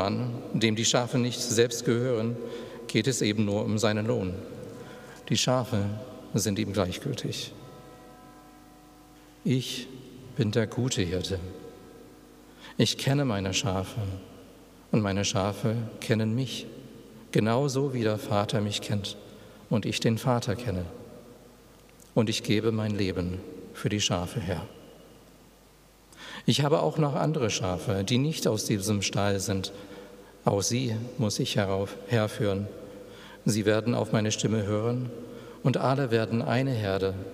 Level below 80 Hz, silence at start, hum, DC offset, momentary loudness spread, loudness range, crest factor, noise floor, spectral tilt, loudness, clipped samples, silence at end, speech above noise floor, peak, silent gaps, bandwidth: -62 dBFS; 0 s; none; under 0.1%; 17 LU; 5 LU; 22 dB; -56 dBFS; -5 dB/octave; -28 LUFS; under 0.1%; 0 s; 29 dB; -8 dBFS; none; 15.5 kHz